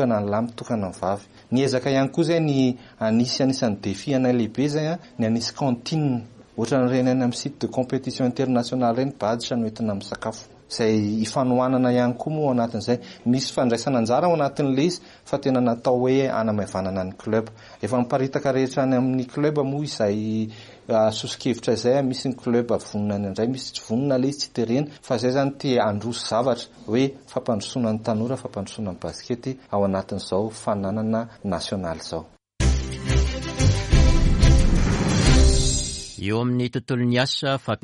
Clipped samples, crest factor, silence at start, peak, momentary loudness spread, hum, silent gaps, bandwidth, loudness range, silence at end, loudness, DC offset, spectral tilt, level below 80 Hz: under 0.1%; 18 dB; 0 s; -4 dBFS; 9 LU; none; none; 11.5 kHz; 5 LU; 0.1 s; -23 LUFS; under 0.1%; -6 dB/octave; -30 dBFS